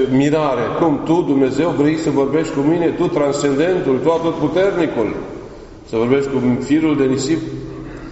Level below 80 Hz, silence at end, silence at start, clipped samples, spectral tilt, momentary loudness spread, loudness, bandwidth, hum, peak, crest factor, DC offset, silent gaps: -42 dBFS; 0 s; 0 s; under 0.1%; -6 dB/octave; 10 LU; -17 LUFS; 8 kHz; none; -2 dBFS; 14 dB; under 0.1%; none